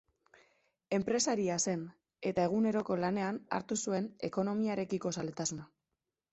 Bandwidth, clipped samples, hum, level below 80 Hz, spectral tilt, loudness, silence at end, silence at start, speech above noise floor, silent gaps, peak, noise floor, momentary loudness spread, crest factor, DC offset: 8.2 kHz; under 0.1%; none; -70 dBFS; -4.5 dB/octave; -34 LUFS; 0.65 s; 0.9 s; 55 dB; none; -18 dBFS; -89 dBFS; 7 LU; 16 dB; under 0.1%